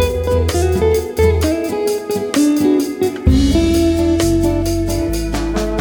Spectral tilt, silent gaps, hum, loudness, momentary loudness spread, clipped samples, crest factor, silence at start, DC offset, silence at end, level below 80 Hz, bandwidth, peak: -6 dB/octave; none; none; -16 LUFS; 6 LU; under 0.1%; 14 dB; 0 s; under 0.1%; 0 s; -24 dBFS; over 20 kHz; -2 dBFS